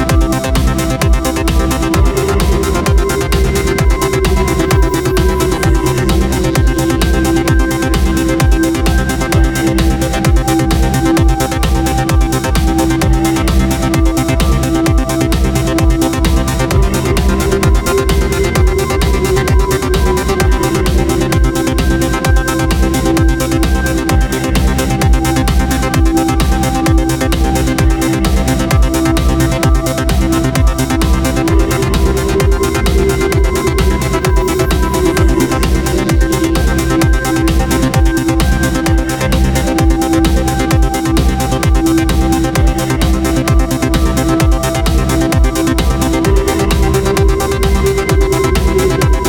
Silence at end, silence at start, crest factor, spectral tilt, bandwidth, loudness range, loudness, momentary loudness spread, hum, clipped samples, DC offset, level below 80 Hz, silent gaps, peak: 0 s; 0 s; 10 dB; -5.5 dB/octave; 18.5 kHz; 0 LU; -13 LUFS; 2 LU; none; under 0.1%; under 0.1%; -14 dBFS; none; 0 dBFS